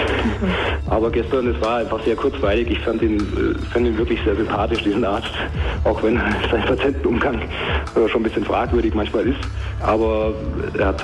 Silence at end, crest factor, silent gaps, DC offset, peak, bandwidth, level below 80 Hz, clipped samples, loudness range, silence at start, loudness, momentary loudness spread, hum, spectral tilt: 0 s; 10 dB; none; under 0.1%; -8 dBFS; 11 kHz; -28 dBFS; under 0.1%; 1 LU; 0 s; -20 LUFS; 4 LU; none; -7 dB/octave